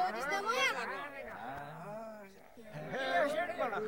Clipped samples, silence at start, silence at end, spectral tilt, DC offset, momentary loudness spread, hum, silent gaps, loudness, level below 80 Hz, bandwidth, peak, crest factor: under 0.1%; 0 s; 0 s; -3 dB/octave; under 0.1%; 18 LU; none; none; -36 LUFS; -70 dBFS; 19.5 kHz; -20 dBFS; 18 dB